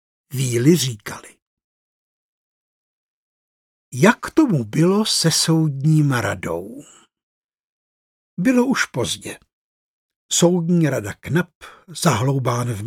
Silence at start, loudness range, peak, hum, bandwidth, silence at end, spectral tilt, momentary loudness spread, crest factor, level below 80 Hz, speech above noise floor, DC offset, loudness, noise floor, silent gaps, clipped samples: 0.3 s; 6 LU; 0 dBFS; none; 17 kHz; 0 s; -5 dB/octave; 16 LU; 20 dB; -58 dBFS; over 71 dB; under 0.1%; -19 LUFS; under -90 dBFS; 1.42-1.57 s, 1.64-3.91 s, 7.23-7.49 s, 7.60-8.37 s, 9.53-10.09 s, 10.16-10.29 s, 11.55-11.61 s; under 0.1%